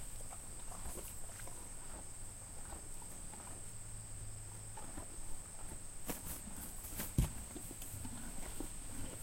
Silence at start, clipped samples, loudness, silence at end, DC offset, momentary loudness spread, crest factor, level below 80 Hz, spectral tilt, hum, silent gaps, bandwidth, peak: 0 s; under 0.1%; -47 LUFS; 0 s; under 0.1%; 6 LU; 24 dB; -50 dBFS; -4 dB/octave; none; none; 16.5 kHz; -20 dBFS